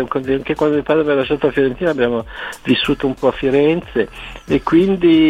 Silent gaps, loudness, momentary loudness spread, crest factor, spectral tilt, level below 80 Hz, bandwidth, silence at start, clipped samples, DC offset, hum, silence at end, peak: none; -16 LUFS; 8 LU; 14 dB; -7 dB/octave; -40 dBFS; 11.5 kHz; 0 s; under 0.1%; 0.1%; none; 0 s; -2 dBFS